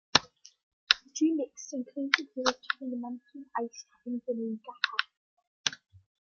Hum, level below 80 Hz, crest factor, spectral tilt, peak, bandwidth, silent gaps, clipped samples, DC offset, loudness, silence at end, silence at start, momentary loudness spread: none; -72 dBFS; 32 dB; -2 dB/octave; -2 dBFS; 7.2 kHz; 0.63-0.87 s, 5.17-5.37 s, 5.47-5.64 s; under 0.1%; under 0.1%; -31 LUFS; 0.55 s; 0.15 s; 13 LU